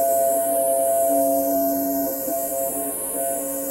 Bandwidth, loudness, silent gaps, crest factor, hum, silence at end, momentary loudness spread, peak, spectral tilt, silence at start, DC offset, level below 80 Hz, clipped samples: 16.5 kHz; -21 LUFS; none; 12 dB; none; 0 s; 5 LU; -10 dBFS; -3.5 dB/octave; 0 s; under 0.1%; -60 dBFS; under 0.1%